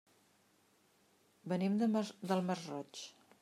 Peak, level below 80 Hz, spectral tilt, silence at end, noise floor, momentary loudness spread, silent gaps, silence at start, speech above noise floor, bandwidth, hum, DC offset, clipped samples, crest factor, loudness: -20 dBFS; -88 dBFS; -6.5 dB/octave; 0.3 s; -72 dBFS; 16 LU; none; 1.45 s; 35 dB; 13.5 kHz; none; under 0.1%; under 0.1%; 20 dB; -37 LUFS